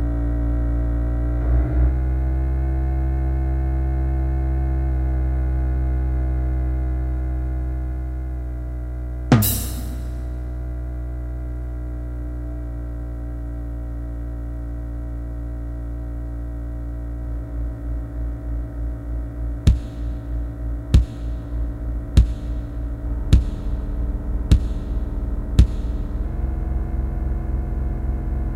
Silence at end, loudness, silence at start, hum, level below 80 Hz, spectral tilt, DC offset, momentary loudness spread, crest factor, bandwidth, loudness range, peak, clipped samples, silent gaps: 0 s; -25 LUFS; 0 s; none; -22 dBFS; -7 dB/octave; under 0.1%; 11 LU; 22 dB; 16 kHz; 8 LU; 0 dBFS; under 0.1%; none